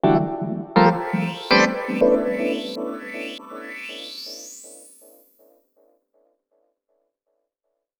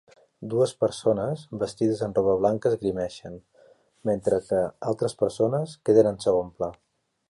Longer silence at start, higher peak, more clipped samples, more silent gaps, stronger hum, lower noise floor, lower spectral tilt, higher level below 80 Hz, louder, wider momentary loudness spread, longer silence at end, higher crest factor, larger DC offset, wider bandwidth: second, 0.05 s vs 0.4 s; first, 0 dBFS vs -6 dBFS; neither; neither; neither; first, -79 dBFS vs -58 dBFS; second, -5.5 dB/octave vs -7 dB/octave; about the same, -56 dBFS vs -58 dBFS; first, -22 LUFS vs -25 LUFS; first, 18 LU vs 12 LU; first, 3.15 s vs 0.55 s; about the same, 24 dB vs 20 dB; neither; first, over 20 kHz vs 11.5 kHz